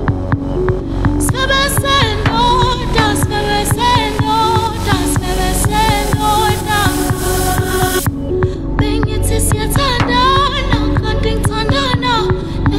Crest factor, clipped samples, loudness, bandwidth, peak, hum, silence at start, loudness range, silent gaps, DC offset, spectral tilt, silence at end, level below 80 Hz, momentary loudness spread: 14 dB; under 0.1%; -14 LUFS; 16.5 kHz; 0 dBFS; none; 0 s; 2 LU; none; under 0.1%; -4.5 dB/octave; 0 s; -22 dBFS; 5 LU